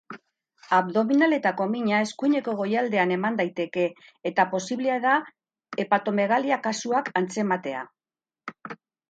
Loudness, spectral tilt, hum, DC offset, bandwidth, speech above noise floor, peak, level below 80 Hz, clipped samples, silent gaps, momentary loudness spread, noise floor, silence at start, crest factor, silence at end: -25 LUFS; -5 dB/octave; none; under 0.1%; 9.2 kHz; over 66 dB; -6 dBFS; -76 dBFS; under 0.1%; none; 17 LU; under -90 dBFS; 0.1 s; 20 dB; 0.35 s